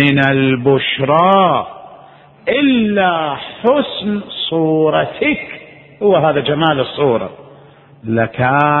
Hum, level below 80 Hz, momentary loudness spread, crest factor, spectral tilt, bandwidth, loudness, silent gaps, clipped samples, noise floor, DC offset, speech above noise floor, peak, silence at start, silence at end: none; -50 dBFS; 9 LU; 14 dB; -9 dB/octave; 4.2 kHz; -14 LUFS; none; under 0.1%; -42 dBFS; under 0.1%; 29 dB; 0 dBFS; 0 s; 0 s